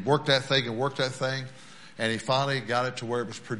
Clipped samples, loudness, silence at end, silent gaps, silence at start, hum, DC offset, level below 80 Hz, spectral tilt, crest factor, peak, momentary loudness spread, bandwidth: under 0.1%; -27 LUFS; 0 s; none; 0 s; none; 0.3%; -66 dBFS; -4.5 dB/octave; 20 dB; -8 dBFS; 11 LU; 11.5 kHz